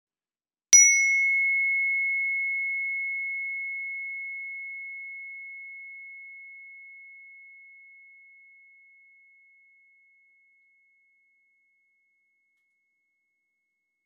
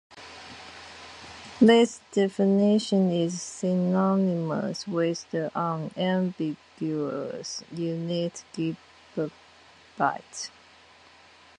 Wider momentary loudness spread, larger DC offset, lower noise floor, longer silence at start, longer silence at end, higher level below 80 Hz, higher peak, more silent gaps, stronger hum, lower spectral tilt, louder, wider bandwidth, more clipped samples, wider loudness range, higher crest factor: first, 27 LU vs 21 LU; neither; first, under -90 dBFS vs -54 dBFS; first, 0.7 s vs 0.1 s; first, 6.5 s vs 1.1 s; second, under -90 dBFS vs -68 dBFS; first, -4 dBFS vs -8 dBFS; neither; neither; second, 6 dB/octave vs -6 dB/octave; first, -22 LUFS vs -26 LUFS; about the same, 11.5 kHz vs 10.5 kHz; neither; first, 26 LU vs 9 LU; first, 26 dB vs 20 dB